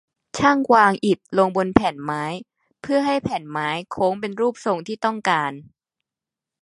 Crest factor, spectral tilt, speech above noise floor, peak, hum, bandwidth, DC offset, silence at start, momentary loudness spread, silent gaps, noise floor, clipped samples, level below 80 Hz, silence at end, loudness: 22 dB; -5.5 dB/octave; 68 dB; 0 dBFS; none; 11.5 kHz; under 0.1%; 0.35 s; 13 LU; none; -88 dBFS; under 0.1%; -52 dBFS; 1 s; -21 LUFS